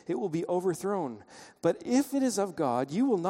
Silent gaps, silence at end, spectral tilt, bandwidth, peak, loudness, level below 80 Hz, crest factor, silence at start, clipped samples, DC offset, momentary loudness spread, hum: none; 0 s; -5.5 dB/octave; 16 kHz; -12 dBFS; -30 LUFS; -72 dBFS; 16 dB; 0.1 s; under 0.1%; under 0.1%; 6 LU; none